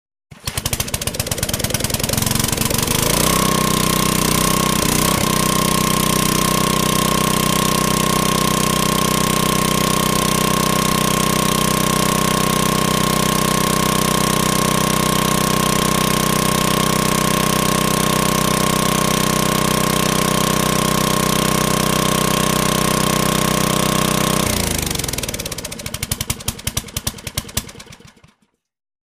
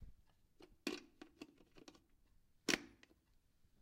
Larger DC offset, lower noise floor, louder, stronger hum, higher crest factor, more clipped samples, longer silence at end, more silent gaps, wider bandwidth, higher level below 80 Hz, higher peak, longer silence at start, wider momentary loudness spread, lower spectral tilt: neither; second, -63 dBFS vs -75 dBFS; first, -16 LUFS vs -44 LUFS; neither; second, 14 dB vs 34 dB; neither; first, 1.1 s vs 0.85 s; neither; about the same, 15.5 kHz vs 15.5 kHz; first, -34 dBFS vs -70 dBFS; first, -2 dBFS vs -18 dBFS; first, 0.3 s vs 0 s; second, 6 LU vs 23 LU; first, -3.5 dB/octave vs -2 dB/octave